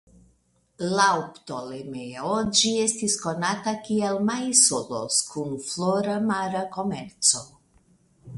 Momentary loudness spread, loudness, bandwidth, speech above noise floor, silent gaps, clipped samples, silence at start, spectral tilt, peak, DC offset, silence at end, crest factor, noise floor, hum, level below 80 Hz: 13 LU; -23 LUFS; 11.5 kHz; 41 dB; none; under 0.1%; 0.8 s; -2.5 dB/octave; -2 dBFS; under 0.1%; 0 s; 24 dB; -66 dBFS; none; -62 dBFS